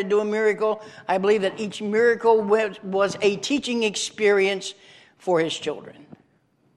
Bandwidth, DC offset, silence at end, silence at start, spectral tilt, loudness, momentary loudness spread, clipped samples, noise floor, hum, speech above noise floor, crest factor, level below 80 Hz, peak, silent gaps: 11.5 kHz; under 0.1%; 0.75 s; 0 s; -4 dB/octave; -22 LUFS; 11 LU; under 0.1%; -64 dBFS; none; 41 dB; 16 dB; -70 dBFS; -6 dBFS; none